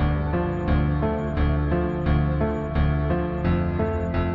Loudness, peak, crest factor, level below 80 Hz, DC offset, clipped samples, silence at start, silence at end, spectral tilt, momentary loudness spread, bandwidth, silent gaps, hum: -24 LUFS; -10 dBFS; 12 dB; -28 dBFS; under 0.1%; under 0.1%; 0 s; 0 s; -10 dB/octave; 2 LU; 4.9 kHz; none; none